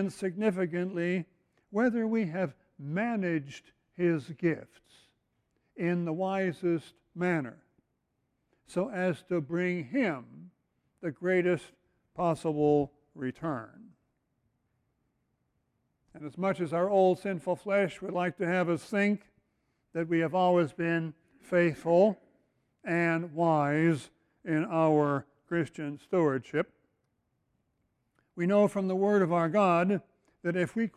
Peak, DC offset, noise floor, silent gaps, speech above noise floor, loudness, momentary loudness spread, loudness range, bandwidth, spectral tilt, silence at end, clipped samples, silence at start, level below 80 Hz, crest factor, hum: -12 dBFS; under 0.1%; -79 dBFS; none; 50 dB; -30 LUFS; 13 LU; 5 LU; 12 kHz; -7.5 dB/octave; 0.1 s; under 0.1%; 0 s; -72 dBFS; 18 dB; none